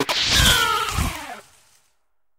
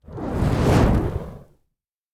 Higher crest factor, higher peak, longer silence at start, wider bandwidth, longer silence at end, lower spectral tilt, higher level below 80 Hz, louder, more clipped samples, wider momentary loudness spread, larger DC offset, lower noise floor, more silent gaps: about the same, 20 dB vs 16 dB; first, -2 dBFS vs -6 dBFS; about the same, 0 s vs 0.1 s; about the same, 17.5 kHz vs 16 kHz; first, 1 s vs 0.75 s; second, -2 dB/octave vs -7.5 dB/octave; about the same, -32 dBFS vs -28 dBFS; first, -18 LUFS vs -21 LUFS; neither; first, 18 LU vs 14 LU; neither; second, -72 dBFS vs -77 dBFS; neither